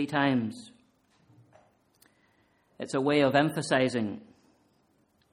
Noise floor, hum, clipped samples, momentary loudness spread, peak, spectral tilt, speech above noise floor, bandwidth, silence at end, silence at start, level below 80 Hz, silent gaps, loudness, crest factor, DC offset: -69 dBFS; none; under 0.1%; 18 LU; -8 dBFS; -5.5 dB/octave; 42 dB; 15.5 kHz; 1.1 s; 0 s; -70 dBFS; none; -27 LUFS; 22 dB; under 0.1%